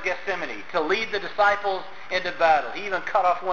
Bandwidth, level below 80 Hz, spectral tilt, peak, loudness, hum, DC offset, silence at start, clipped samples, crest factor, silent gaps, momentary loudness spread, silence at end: 7.2 kHz; -60 dBFS; -3.5 dB/octave; -8 dBFS; -24 LUFS; none; 1%; 0 s; under 0.1%; 16 dB; none; 8 LU; 0 s